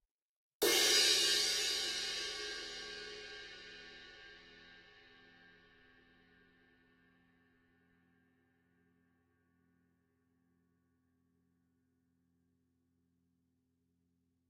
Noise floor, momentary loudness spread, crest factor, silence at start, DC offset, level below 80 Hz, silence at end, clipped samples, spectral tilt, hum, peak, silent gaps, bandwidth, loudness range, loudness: -81 dBFS; 25 LU; 26 dB; 0.6 s; under 0.1%; -74 dBFS; 9.75 s; under 0.1%; 1 dB/octave; none; -16 dBFS; none; 16 kHz; 24 LU; -32 LUFS